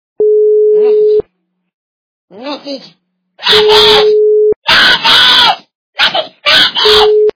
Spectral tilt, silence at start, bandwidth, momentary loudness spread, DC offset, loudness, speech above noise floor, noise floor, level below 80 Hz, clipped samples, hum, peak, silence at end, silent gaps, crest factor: -2 dB/octave; 0.2 s; 5.4 kHz; 18 LU; under 0.1%; -6 LUFS; 51 dB; -59 dBFS; -44 dBFS; 2%; none; 0 dBFS; 0.05 s; 1.74-2.28 s, 4.56-4.62 s, 5.75-5.93 s; 10 dB